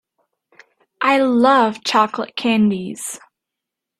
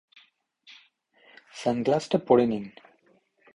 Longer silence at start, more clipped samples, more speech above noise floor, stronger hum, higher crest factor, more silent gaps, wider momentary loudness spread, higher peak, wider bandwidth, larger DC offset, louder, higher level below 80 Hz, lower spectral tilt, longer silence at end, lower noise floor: second, 1 s vs 1.55 s; neither; first, 66 dB vs 41 dB; neither; about the same, 18 dB vs 22 dB; neither; second, 14 LU vs 18 LU; first, -2 dBFS vs -6 dBFS; first, 14 kHz vs 11 kHz; neither; first, -17 LUFS vs -25 LUFS; about the same, -66 dBFS vs -66 dBFS; second, -4.5 dB/octave vs -6.5 dB/octave; about the same, 0.85 s vs 0.85 s; first, -83 dBFS vs -65 dBFS